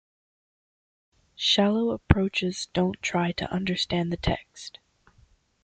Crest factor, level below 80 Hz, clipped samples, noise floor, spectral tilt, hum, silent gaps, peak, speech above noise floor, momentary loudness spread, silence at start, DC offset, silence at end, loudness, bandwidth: 28 dB; -44 dBFS; under 0.1%; -61 dBFS; -5 dB/octave; none; none; 0 dBFS; 35 dB; 10 LU; 1.4 s; under 0.1%; 0.95 s; -26 LUFS; 9.2 kHz